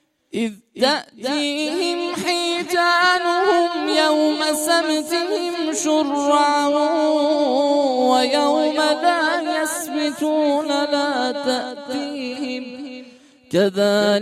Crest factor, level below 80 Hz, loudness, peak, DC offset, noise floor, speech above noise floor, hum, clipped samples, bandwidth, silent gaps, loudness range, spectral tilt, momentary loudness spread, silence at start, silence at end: 16 dB; -68 dBFS; -19 LUFS; -4 dBFS; under 0.1%; -46 dBFS; 27 dB; none; under 0.1%; 15.5 kHz; none; 5 LU; -3 dB/octave; 10 LU; 0.35 s; 0 s